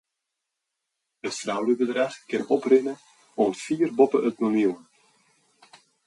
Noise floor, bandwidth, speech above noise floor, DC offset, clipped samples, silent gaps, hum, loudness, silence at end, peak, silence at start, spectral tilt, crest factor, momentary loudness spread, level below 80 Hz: -83 dBFS; 11.5 kHz; 60 dB; under 0.1%; under 0.1%; none; none; -24 LUFS; 1.3 s; -6 dBFS; 1.25 s; -5 dB/octave; 20 dB; 14 LU; -76 dBFS